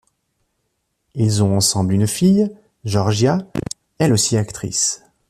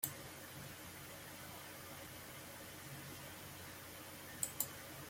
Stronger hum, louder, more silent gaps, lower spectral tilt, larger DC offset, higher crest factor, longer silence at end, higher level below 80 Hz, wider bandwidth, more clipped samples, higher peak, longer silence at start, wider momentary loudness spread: neither; first, -18 LUFS vs -48 LUFS; neither; first, -5 dB/octave vs -2.5 dB/octave; neither; second, 16 dB vs 32 dB; first, 0.35 s vs 0 s; first, -50 dBFS vs -72 dBFS; second, 14 kHz vs 16.5 kHz; neither; first, -4 dBFS vs -18 dBFS; first, 1.15 s vs 0 s; first, 12 LU vs 8 LU